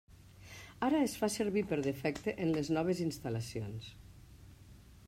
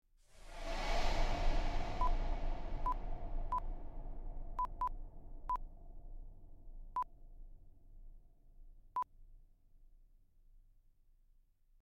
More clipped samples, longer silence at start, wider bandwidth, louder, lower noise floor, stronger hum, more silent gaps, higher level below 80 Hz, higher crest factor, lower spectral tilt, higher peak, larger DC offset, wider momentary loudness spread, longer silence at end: neither; second, 0.1 s vs 0.35 s; first, 16 kHz vs 7.8 kHz; first, -35 LUFS vs -43 LUFS; second, -57 dBFS vs -69 dBFS; neither; neither; second, -60 dBFS vs -42 dBFS; about the same, 18 dB vs 18 dB; about the same, -5.5 dB/octave vs -5 dB/octave; about the same, -20 dBFS vs -22 dBFS; neither; second, 17 LU vs 22 LU; second, 0 s vs 1.25 s